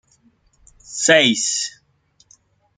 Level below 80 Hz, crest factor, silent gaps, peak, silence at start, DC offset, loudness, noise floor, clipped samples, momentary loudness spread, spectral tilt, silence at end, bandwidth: -62 dBFS; 20 dB; none; -2 dBFS; 0.9 s; under 0.1%; -16 LUFS; -60 dBFS; under 0.1%; 15 LU; -1.5 dB/octave; 1.1 s; 9.8 kHz